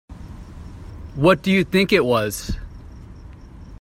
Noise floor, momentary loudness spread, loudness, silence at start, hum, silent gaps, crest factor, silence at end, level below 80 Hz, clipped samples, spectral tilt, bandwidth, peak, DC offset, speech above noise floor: -40 dBFS; 24 LU; -19 LUFS; 0.1 s; none; none; 22 dB; 0.05 s; -38 dBFS; under 0.1%; -5.5 dB/octave; 16 kHz; 0 dBFS; under 0.1%; 22 dB